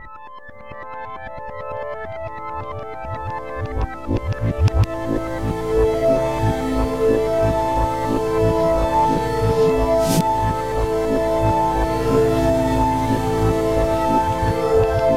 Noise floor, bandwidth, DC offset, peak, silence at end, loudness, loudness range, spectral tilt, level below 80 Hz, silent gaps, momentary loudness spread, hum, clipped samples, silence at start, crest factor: -39 dBFS; 16 kHz; 1%; -4 dBFS; 0 s; -20 LUFS; 10 LU; -7 dB/octave; -30 dBFS; none; 13 LU; none; under 0.1%; 0 s; 14 dB